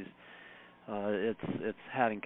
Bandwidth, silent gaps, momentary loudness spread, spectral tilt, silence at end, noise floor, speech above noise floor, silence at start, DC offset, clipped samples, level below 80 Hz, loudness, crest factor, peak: 4 kHz; none; 19 LU; -4.5 dB/octave; 0.05 s; -55 dBFS; 21 dB; 0 s; under 0.1%; under 0.1%; -72 dBFS; -36 LUFS; 22 dB; -14 dBFS